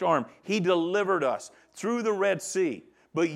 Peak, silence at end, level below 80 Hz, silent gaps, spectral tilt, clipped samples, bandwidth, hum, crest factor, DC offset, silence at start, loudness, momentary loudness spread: -10 dBFS; 0 s; -80 dBFS; none; -5 dB/octave; under 0.1%; 14 kHz; none; 18 dB; under 0.1%; 0 s; -28 LUFS; 11 LU